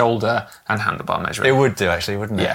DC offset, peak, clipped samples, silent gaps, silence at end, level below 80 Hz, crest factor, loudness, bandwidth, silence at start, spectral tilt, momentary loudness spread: under 0.1%; -2 dBFS; under 0.1%; none; 0 s; -50 dBFS; 18 dB; -20 LUFS; 17 kHz; 0 s; -5 dB/octave; 7 LU